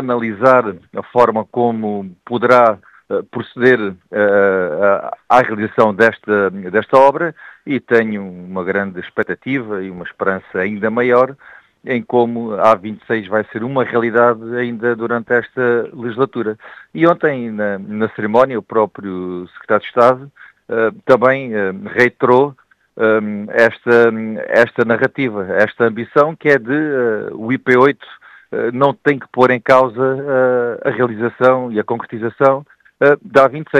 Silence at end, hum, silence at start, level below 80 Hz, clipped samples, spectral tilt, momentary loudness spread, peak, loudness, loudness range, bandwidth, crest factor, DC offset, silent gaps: 0 s; none; 0 s; -60 dBFS; under 0.1%; -7.5 dB/octave; 11 LU; 0 dBFS; -15 LUFS; 3 LU; 9 kHz; 16 dB; under 0.1%; none